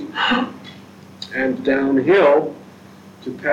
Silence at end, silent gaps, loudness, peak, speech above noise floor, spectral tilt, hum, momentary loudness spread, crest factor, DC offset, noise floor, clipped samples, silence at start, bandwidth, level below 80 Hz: 0 s; none; -18 LUFS; -4 dBFS; 26 dB; -6 dB/octave; none; 23 LU; 16 dB; under 0.1%; -42 dBFS; under 0.1%; 0 s; 9.4 kHz; -58 dBFS